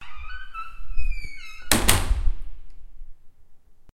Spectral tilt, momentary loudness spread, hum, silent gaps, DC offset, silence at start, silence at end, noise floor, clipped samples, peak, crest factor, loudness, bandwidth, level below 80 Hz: -2.5 dB/octave; 20 LU; none; none; under 0.1%; 0 s; 0.1 s; -44 dBFS; under 0.1%; 0 dBFS; 22 dB; -26 LUFS; 16 kHz; -30 dBFS